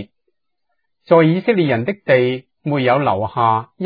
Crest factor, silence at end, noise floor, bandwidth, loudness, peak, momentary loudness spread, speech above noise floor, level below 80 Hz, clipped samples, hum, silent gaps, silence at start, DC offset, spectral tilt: 18 dB; 0 s; -75 dBFS; 5 kHz; -16 LUFS; 0 dBFS; 7 LU; 59 dB; -60 dBFS; under 0.1%; none; none; 0 s; under 0.1%; -10 dB/octave